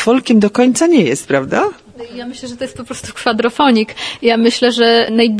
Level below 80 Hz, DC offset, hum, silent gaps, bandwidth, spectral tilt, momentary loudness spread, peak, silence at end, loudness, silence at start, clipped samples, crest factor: -52 dBFS; under 0.1%; none; none; 11 kHz; -4 dB/octave; 16 LU; 0 dBFS; 0 s; -13 LUFS; 0 s; under 0.1%; 14 dB